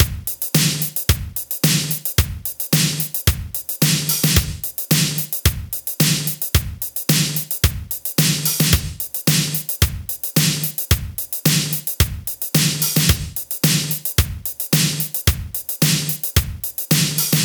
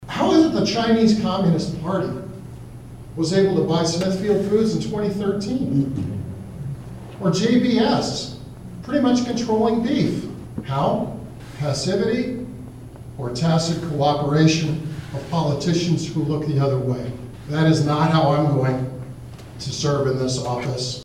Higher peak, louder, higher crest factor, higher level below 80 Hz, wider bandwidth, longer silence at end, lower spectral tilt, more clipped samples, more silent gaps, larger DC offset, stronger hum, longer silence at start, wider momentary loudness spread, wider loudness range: first, 0 dBFS vs -4 dBFS; first, -18 LUFS vs -21 LUFS; about the same, 20 dB vs 18 dB; first, -30 dBFS vs -46 dBFS; first, over 20 kHz vs 12.5 kHz; about the same, 0 s vs 0 s; second, -3.5 dB/octave vs -6 dB/octave; neither; neither; neither; neither; about the same, 0 s vs 0 s; second, 8 LU vs 18 LU; about the same, 1 LU vs 3 LU